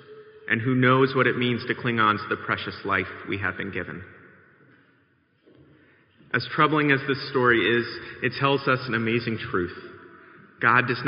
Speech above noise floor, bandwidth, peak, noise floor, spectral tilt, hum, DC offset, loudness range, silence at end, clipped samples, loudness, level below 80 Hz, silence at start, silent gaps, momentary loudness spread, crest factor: 41 dB; 5.4 kHz; -4 dBFS; -64 dBFS; -3.5 dB/octave; none; under 0.1%; 9 LU; 0 s; under 0.1%; -24 LUFS; -64 dBFS; 0.1 s; none; 12 LU; 22 dB